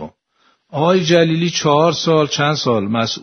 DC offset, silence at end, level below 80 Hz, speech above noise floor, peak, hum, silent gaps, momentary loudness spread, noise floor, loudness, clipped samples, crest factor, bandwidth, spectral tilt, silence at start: under 0.1%; 0.05 s; -56 dBFS; 45 dB; 0 dBFS; none; none; 6 LU; -60 dBFS; -15 LUFS; under 0.1%; 16 dB; 6.6 kHz; -5 dB/octave; 0 s